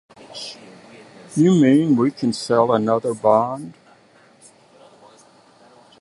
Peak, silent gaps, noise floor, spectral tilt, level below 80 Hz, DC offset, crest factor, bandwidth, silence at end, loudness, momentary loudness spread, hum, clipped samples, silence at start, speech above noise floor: -2 dBFS; none; -52 dBFS; -7 dB/octave; -66 dBFS; under 0.1%; 20 dB; 11.5 kHz; 2.3 s; -18 LUFS; 19 LU; none; under 0.1%; 0.3 s; 35 dB